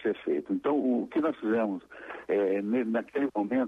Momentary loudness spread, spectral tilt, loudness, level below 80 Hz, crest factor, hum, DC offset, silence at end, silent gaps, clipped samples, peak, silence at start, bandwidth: 5 LU; -8 dB/octave; -29 LUFS; -72 dBFS; 12 dB; none; under 0.1%; 0 s; none; under 0.1%; -18 dBFS; 0 s; 5.8 kHz